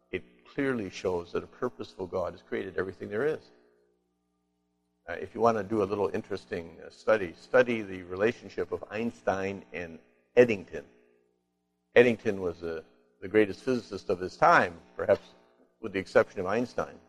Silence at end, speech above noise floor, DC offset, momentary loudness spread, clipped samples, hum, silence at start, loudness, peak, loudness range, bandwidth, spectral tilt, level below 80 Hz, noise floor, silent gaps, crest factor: 0.1 s; 49 dB; under 0.1%; 16 LU; under 0.1%; 60 Hz at -60 dBFS; 0.15 s; -29 LUFS; -6 dBFS; 7 LU; 10.5 kHz; -6 dB/octave; -64 dBFS; -78 dBFS; none; 24 dB